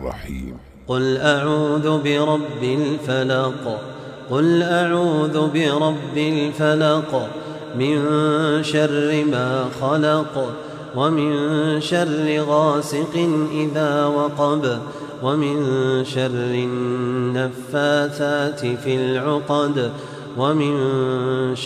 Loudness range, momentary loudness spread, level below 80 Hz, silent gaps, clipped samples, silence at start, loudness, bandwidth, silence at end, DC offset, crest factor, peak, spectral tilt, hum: 2 LU; 9 LU; -50 dBFS; none; under 0.1%; 0 s; -20 LUFS; 13.5 kHz; 0 s; under 0.1%; 16 dB; -4 dBFS; -6 dB/octave; none